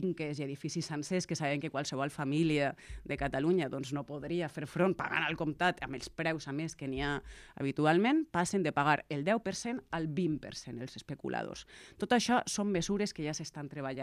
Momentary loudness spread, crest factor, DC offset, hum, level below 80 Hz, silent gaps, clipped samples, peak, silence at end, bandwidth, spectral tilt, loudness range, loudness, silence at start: 11 LU; 20 dB; under 0.1%; none; -58 dBFS; none; under 0.1%; -14 dBFS; 0 s; 14 kHz; -5 dB/octave; 3 LU; -34 LUFS; 0 s